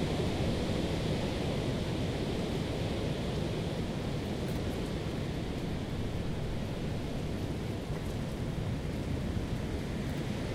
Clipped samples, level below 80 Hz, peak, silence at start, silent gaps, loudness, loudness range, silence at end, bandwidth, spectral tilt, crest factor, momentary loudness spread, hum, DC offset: under 0.1%; -42 dBFS; -18 dBFS; 0 s; none; -35 LUFS; 3 LU; 0 s; 16 kHz; -6.5 dB/octave; 16 dB; 4 LU; none; under 0.1%